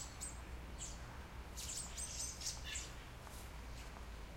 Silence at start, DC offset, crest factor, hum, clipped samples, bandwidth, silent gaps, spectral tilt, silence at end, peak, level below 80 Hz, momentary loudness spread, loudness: 0 s; under 0.1%; 20 dB; none; under 0.1%; 16.5 kHz; none; -2 dB/octave; 0 s; -28 dBFS; -52 dBFS; 10 LU; -47 LUFS